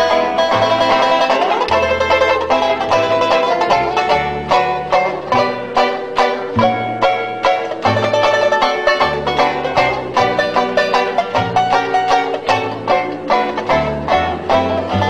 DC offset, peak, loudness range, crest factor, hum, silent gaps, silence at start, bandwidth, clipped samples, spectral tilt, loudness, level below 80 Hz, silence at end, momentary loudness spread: under 0.1%; 0 dBFS; 2 LU; 14 dB; none; none; 0 s; 13.5 kHz; under 0.1%; -4.5 dB/octave; -15 LUFS; -42 dBFS; 0 s; 4 LU